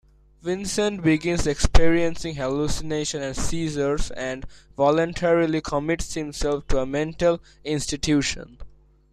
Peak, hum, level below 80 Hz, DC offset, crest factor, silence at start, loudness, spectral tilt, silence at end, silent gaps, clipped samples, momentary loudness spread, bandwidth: -2 dBFS; none; -32 dBFS; under 0.1%; 20 dB; 0.45 s; -24 LUFS; -5 dB/octave; 0.45 s; none; under 0.1%; 9 LU; 13 kHz